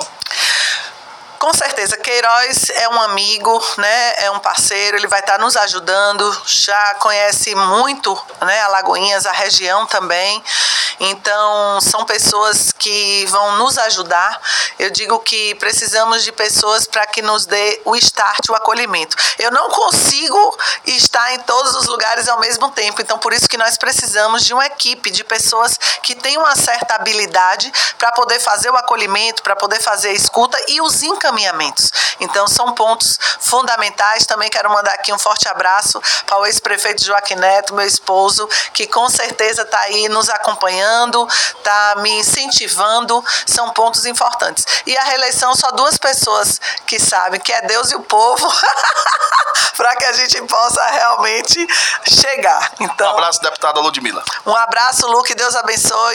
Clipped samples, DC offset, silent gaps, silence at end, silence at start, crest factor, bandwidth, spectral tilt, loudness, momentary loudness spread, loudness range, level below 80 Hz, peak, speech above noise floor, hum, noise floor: under 0.1%; under 0.1%; none; 0 s; 0 s; 14 dB; 17 kHz; 0.5 dB/octave; -12 LUFS; 4 LU; 1 LU; -56 dBFS; 0 dBFS; 21 dB; none; -35 dBFS